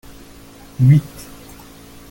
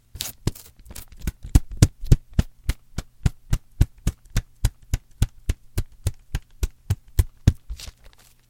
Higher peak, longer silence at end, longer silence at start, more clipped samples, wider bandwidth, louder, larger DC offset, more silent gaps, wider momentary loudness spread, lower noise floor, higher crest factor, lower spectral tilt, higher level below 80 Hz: about the same, -2 dBFS vs 0 dBFS; first, 1.05 s vs 0.65 s; first, 0.8 s vs 0.15 s; neither; about the same, 17 kHz vs 17 kHz; first, -15 LUFS vs -27 LUFS; neither; neither; first, 26 LU vs 15 LU; second, -41 dBFS vs -50 dBFS; second, 18 dB vs 24 dB; first, -8 dB/octave vs -5.5 dB/octave; second, -46 dBFS vs -28 dBFS